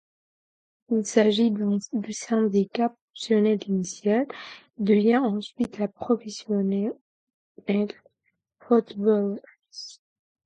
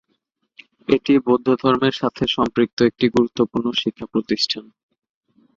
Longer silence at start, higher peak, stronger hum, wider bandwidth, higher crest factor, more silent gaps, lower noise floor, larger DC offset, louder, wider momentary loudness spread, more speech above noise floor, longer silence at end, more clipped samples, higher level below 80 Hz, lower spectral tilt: about the same, 0.9 s vs 0.9 s; second, -6 dBFS vs -2 dBFS; neither; first, 9.2 kHz vs 7.6 kHz; about the same, 20 dB vs 18 dB; first, 3.01-3.08 s, 7.01-7.27 s, 7.34-7.55 s vs 2.73-2.77 s; first, -76 dBFS vs -71 dBFS; neither; second, -25 LUFS vs -19 LUFS; first, 18 LU vs 6 LU; about the same, 52 dB vs 52 dB; second, 0.55 s vs 0.95 s; neither; second, -70 dBFS vs -54 dBFS; about the same, -6 dB/octave vs -5.5 dB/octave